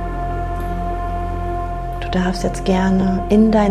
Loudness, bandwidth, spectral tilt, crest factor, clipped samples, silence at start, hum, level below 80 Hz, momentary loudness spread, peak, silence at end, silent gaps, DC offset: -19 LUFS; 12.5 kHz; -7 dB/octave; 14 dB; under 0.1%; 0 s; none; -26 dBFS; 10 LU; -4 dBFS; 0 s; none; under 0.1%